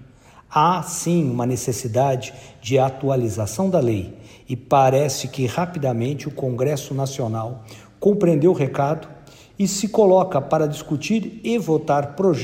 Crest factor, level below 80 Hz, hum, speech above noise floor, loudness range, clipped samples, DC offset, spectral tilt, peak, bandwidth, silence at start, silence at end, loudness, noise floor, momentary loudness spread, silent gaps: 16 dB; -54 dBFS; none; 28 dB; 3 LU; under 0.1%; under 0.1%; -6 dB/octave; -4 dBFS; 16 kHz; 0 s; 0 s; -21 LUFS; -48 dBFS; 10 LU; none